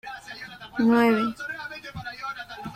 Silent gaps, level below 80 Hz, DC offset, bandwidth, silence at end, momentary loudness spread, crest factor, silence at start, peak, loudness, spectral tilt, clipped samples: none; -58 dBFS; under 0.1%; 15 kHz; 0 s; 18 LU; 18 dB; 0.05 s; -8 dBFS; -25 LUFS; -6 dB/octave; under 0.1%